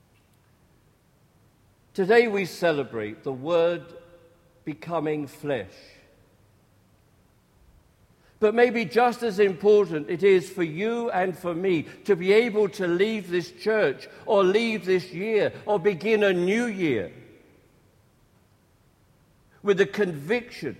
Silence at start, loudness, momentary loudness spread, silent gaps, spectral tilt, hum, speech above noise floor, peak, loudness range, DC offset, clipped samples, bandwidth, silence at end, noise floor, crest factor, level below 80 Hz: 1.95 s; -24 LUFS; 11 LU; none; -6 dB/octave; none; 38 dB; -6 dBFS; 11 LU; under 0.1%; under 0.1%; 13.5 kHz; 0.05 s; -61 dBFS; 20 dB; -66 dBFS